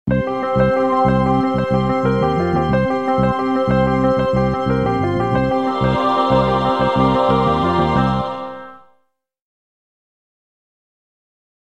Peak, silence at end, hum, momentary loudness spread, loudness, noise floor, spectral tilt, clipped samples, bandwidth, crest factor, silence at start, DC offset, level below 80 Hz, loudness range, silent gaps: -2 dBFS; 2.85 s; none; 4 LU; -17 LUFS; -66 dBFS; -8 dB/octave; under 0.1%; 8.8 kHz; 14 dB; 0.05 s; 0.5%; -36 dBFS; 6 LU; none